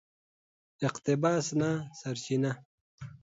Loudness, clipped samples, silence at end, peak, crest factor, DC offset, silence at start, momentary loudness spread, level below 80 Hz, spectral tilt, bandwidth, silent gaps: -31 LUFS; under 0.1%; 0.05 s; -14 dBFS; 18 dB; under 0.1%; 0.8 s; 14 LU; -70 dBFS; -5.5 dB/octave; 8 kHz; 2.65-2.98 s